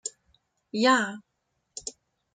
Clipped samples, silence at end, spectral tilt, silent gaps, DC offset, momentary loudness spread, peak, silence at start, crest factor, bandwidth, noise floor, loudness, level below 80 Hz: under 0.1%; 0.45 s; -2.5 dB/octave; none; under 0.1%; 21 LU; -8 dBFS; 0.05 s; 22 dB; 9.6 kHz; -78 dBFS; -25 LUFS; -72 dBFS